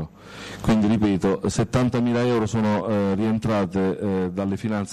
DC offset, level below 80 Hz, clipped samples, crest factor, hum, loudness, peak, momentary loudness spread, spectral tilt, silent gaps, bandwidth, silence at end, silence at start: 0.1%; -46 dBFS; under 0.1%; 10 dB; none; -22 LUFS; -12 dBFS; 6 LU; -7 dB/octave; none; 12.5 kHz; 0 s; 0 s